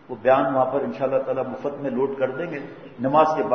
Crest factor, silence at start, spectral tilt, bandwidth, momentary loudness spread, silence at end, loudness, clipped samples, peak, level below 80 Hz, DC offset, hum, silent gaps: 18 dB; 0.1 s; -7.5 dB/octave; 6.4 kHz; 11 LU; 0 s; -23 LUFS; under 0.1%; -6 dBFS; -64 dBFS; 0.1%; none; none